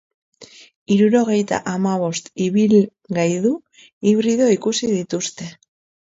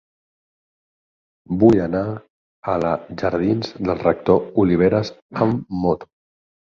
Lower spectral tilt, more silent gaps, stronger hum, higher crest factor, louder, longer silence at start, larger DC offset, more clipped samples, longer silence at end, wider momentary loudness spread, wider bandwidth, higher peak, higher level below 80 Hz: second, -5.5 dB/octave vs -8.5 dB/octave; second, 0.76-0.86 s, 3.93-4.01 s vs 2.30-2.63 s, 5.22-5.29 s; neither; about the same, 16 dB vs 18 dB; about the same, -19 LUFS vs -20 LUFS; second, 0.4 s vs 1.5 s; neither; neither; second, 0.5 s vs 0.65 s; about the same, 10 LU vs 12 LU; first, 8 kHz vs 7.2 kHz; about the same, -4 dBFS vs -2 dBFS; second, -62 dBFS vs -46 dBFS